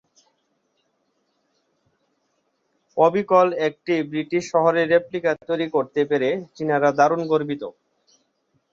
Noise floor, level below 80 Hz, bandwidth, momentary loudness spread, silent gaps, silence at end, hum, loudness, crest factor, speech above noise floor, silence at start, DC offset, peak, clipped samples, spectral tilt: -70 dBFS; -70 dBFS; 7.6 kHz; 8 LU; none; 1 s; none; -21 LUFS; 20 dB; 50 dB; 2.95 s; under 0.1%; -2 dBFS; under 0.1%; -6 dB/octave